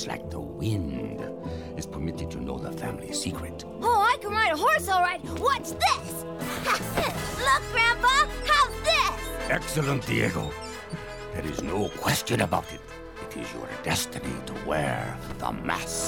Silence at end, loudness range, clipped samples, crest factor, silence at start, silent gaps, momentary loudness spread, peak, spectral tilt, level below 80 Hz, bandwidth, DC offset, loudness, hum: 0 s; 8 LU; under 0.1%; 16 dB; 0 s; none; 14 LU; -12 dBFS; -3.5 dB/octave; -44 dBFS; 18 kHz; 0.1%; -27 LUFS; none